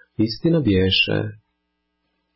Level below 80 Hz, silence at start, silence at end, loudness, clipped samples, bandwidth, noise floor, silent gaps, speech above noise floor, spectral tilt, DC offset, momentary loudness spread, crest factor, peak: -42 dBFS; 0.2 s; 1 s; -19 LUFS; under 0.1%; 5.8 kHz; -74 dBFS; none; 55 dB; -9.5 dB/octave; under 0.1%; 9 LU; 14 dB; -8 dBFS